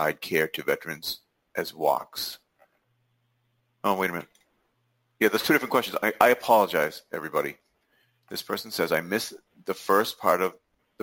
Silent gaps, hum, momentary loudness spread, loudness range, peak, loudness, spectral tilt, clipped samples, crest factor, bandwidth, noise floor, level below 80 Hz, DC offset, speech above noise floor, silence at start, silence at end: none; none; 14 LU; 7 LU; -2 dBFS; -26 LUFS; -3.5 dB/octave; under 0.1%; 26 dB; 17 kHz; -72 dBFS; -68 dBFS; under 0.1%; 47 dB; 0 s; 0.5 s